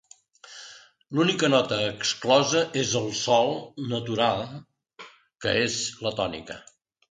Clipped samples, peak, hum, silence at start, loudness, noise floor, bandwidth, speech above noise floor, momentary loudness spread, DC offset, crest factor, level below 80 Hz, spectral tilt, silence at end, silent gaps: under 0.1%; -6 dBFS; none; 0.45 s; -25 LUFS; -51 dBFS; 9.6 kHz; 27 dB; 21 LU; under 0.1%; 22 dB; -60 dBFS; -3.5 dB/octave; 0.5 s; none